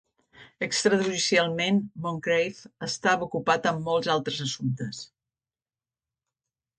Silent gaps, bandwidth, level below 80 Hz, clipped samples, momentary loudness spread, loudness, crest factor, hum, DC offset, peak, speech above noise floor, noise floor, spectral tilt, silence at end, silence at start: none; 9.6 kHz; -66 dBFS; under 0.1%; 11 LU; -26 LUFS; 20 dB; none; under 0.1%; -8 dBFS; over 64 dB; under -90 dBFS; -4 dB/octave; 1.75 s; 0.4 s